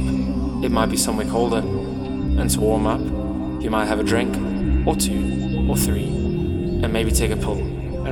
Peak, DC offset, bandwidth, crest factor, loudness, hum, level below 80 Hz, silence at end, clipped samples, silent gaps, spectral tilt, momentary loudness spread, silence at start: -4 dBFS; under 0.1%; over 20 kHz; 18 dB; -21 LUFS; none; -28 dBFS; 0 s; under 0.1%; none; -5.5 dB/octave; 6 LU; 0 s